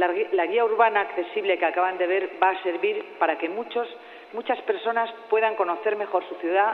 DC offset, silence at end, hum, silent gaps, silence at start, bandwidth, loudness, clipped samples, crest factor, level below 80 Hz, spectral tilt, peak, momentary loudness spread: under 0.1%; 0 s; none; none; 0 s; 4.6 kHz; -24 LUFS; under 0.1%; 18 dB; -80 dBFS; -5.5 dB/octave; -6 dBFS; 8 LU